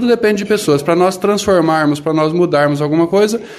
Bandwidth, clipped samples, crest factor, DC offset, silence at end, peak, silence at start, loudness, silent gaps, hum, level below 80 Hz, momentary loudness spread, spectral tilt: 14 kHz; under 0.1%; 12 dB; under 0.1%; 0 s; -2 dBFS; 0 s; -13 LUFS; none; none; -48 dBFS; 3 LU; -5.5 dB/octave